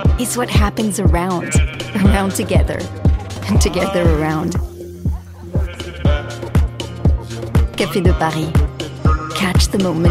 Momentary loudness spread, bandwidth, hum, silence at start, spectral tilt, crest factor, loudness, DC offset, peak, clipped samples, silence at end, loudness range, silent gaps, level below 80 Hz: 8 LU; 15.5 kHz; none; 0 s; -5.5 dB/octave; 14 dB; -17 LUFS; under 0.1%; -2 dBFS; under 0.1%; 0 s; 4 LU; none; -20 dBFS